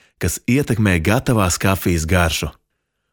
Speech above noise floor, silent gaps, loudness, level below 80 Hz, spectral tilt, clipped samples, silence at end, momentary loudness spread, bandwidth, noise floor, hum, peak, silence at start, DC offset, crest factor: 56 dB; none; -18 LUFS; -34 dBFS; -5 dB/octave; under 0.1%; 0.6 s; 7 LU; over 20 kHz; -73 dBFS; none; -2 dBFS; 0.2 s; under 0.1%; 16 dB